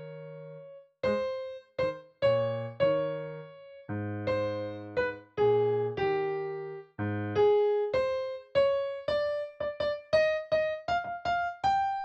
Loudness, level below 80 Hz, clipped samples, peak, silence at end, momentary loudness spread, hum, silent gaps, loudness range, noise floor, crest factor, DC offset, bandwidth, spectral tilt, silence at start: -30 LUFS; -60 dBFS; under 0.1%; -14 dBFS; 0 s; 13 LU; none; none; 3 LU; -49 dBFS; 16 dB; under 0.1%; 8 kHz; -6.5 dB/octave; 0 s